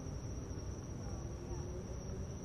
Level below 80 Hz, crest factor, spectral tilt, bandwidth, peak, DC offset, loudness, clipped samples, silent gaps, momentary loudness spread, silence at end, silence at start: -48 dBFS; 12 dB; -6 dB/octave; 13.5 kHz; -32 dBFS; under 0.1%; -45 LUFS; under 0.1%; none; 1 LU; 0 s; 0 s